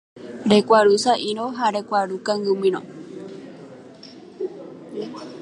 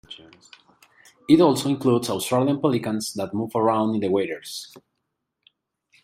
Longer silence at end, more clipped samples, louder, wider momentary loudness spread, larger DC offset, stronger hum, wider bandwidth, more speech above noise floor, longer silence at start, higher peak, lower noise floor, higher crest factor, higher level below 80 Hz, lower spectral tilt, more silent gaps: second, 0 s vs 1.4 s; neither; about the same, -20 LUFS vs -22 LUFS; first, 26 LU vs 19 LU; neither; neither; second, 11.5 kHz vs 16 kHz; second, 23 dB vs 56 dB; about the same, 0.15 s vs 0.1 s; about the same, -2 dBFS vs -4 dBFS; second, -43 dBFS vs -79 dBFS; about the same, 20 dB vs 20 dB; about the same, -66 dBFS vs -64 dBFS; about the same, -4.5 dB/octave vs -5.5 dB/octave; neither